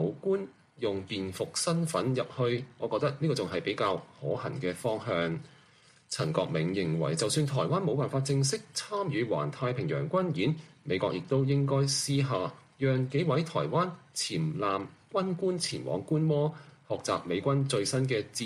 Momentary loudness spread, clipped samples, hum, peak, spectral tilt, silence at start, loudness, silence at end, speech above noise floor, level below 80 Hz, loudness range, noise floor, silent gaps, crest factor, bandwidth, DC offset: 6 LU; under 0.1%; none; -14 dBFS; -5.5 dB/octave; 0 s; -31 LUFS; 0 s; 31 dB; -66 dBFS; 3 LU; -61 dBFS; none; 18 dB; 13.5 kHz; under 0.1%